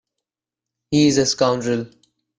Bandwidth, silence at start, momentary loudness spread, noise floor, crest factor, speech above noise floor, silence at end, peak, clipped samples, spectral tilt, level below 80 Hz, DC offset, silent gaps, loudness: 10 kHz; 0.9 s; 10 LU; -88 dBFS; 16 dB; 70 dB; 0.55 s; -4 dBFS; under 0.1%; -4.5 dB/octave; -54 dBFS; under 0.1%; none; -19 LUFS